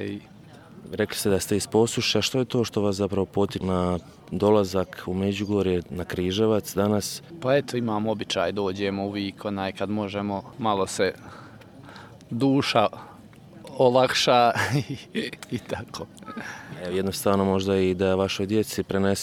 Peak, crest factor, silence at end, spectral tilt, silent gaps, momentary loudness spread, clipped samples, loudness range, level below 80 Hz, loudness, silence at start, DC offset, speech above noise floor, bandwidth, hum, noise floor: -4 dBFS; 22 dB; 0 s; -5 dB/octave; none; 15 LU; under 0.1%; 5 LU; -56 dBFS; -25 LUFS; 0 s; under 0.1%; 22 dB; 17 kHz; none; -47 dBFS